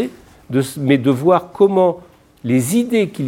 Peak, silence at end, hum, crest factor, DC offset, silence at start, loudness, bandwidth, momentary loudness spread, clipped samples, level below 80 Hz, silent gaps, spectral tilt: 0 dBFS; 0 s; none; 16 dB; under 0.1%; 0 s; -16 LUFS; 17 kHz; 10 LU; under 0.1%; -56 dBFS; none; -6.5 dB/octave